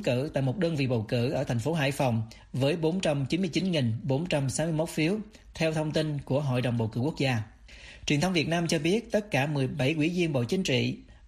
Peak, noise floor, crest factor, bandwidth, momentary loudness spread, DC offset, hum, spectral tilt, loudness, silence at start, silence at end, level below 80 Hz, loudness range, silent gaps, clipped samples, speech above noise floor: -14 dBFS; -49 dBFS; 14 dB; 13.5 kHz; 4 LU; under 0.1%; none; -6 dB/octave; -28 LUFS; 0 s; 0 s; -54 dBFS; 2 LU; none; under 0.1%; 21 dB